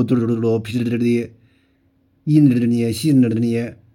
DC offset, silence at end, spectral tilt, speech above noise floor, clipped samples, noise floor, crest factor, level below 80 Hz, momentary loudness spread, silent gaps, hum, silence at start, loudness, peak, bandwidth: under 0.1%; 0.2 s; -7.5 dB/octave; 43 dB; under 0.1%; -60 dBFS; 14 dB; -60 dBFS; 8 LU; none; none; 0 s; -18 LUFS; -4 dBFS; 16.5 kHz